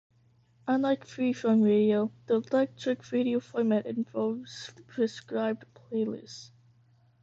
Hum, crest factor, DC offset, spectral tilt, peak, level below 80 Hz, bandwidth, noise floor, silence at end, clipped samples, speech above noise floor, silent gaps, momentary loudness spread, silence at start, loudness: none; 14 dB; under 0.1%; -6.5 dB/octave; -16 dBFS; -74 dBFS; 7.8 kHz; -64 dBFS; 0.75 s; under 0.1%; 36 dB; none; 16 LU; 0.65 s; -29 LUFS